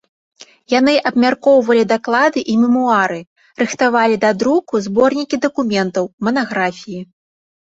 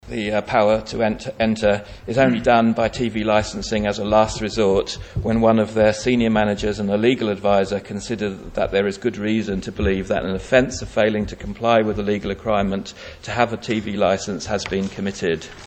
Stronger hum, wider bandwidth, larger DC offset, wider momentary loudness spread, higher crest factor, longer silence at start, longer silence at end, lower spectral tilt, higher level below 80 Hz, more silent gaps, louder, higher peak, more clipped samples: neither; about the same, 8 kHz vs 8.8 kHz; neither; about the same, 8 LU vs 8 LU; about the same, 14 dB vs 18 dB; first, 0.7 s vs 0.05 s; first, 0.7 s vs 0 s; about the same, -5 dB/octave vs -5.5 dB/octave; second, -58 dBFS vs -40 dBFS; first, 3.27-3.36 s, 6.13-6.18 s vs none; first, -15 LUFS vs -20 LUFS; about the same, -2 dBFS vs -2 dBFS; neither